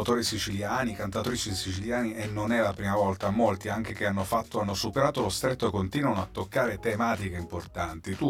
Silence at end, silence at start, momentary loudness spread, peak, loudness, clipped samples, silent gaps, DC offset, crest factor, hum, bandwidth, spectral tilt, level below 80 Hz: 0 s; 0 s; 6 LU; -10 dBFS; -29 LUFS; under 0.1%; none; under 0.1%; 18 dB; none; 17 kHz; -5 dB/octave; -52 dBFS